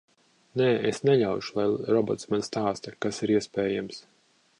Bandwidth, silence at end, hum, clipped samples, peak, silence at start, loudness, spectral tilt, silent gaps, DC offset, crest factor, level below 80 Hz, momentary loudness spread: 10.5 kHz; 0.6 s; none; under 0.1%; -10 dBFS; 0.55 s; -27 LUFS; -6 dB/octave; none; under 0.1%; 18 dB; -64 dBFS; 9 LU